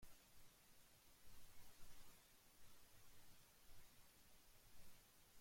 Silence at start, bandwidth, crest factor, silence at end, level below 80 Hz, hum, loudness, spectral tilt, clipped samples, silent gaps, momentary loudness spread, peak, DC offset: 0 s; 16.5 kHz; 16 dB; 0 s; -74 dBFS; none; -69 LUFS; -2.5 dB/octave; under 0.1%; none; 2 LU; -46 dBFS; under 0.1%